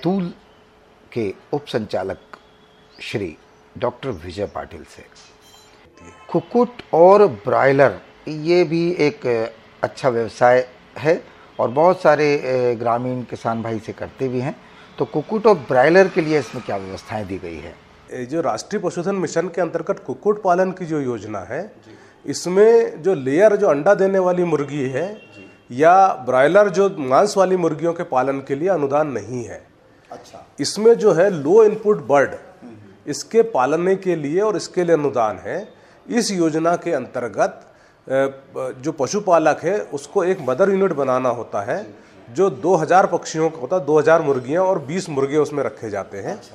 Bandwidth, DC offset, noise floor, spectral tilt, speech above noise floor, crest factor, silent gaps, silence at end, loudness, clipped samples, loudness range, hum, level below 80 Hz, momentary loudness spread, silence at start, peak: 12.5 kHz; under 0.1%; -51 dBFS; -5.5 dB/octave; 32 dB; 18 dB; none; 0.1 s; -19 LUFS; under 0.1%; 8 LU; none; -58 dBFS; 15 LU; 0 s; 0 dBFS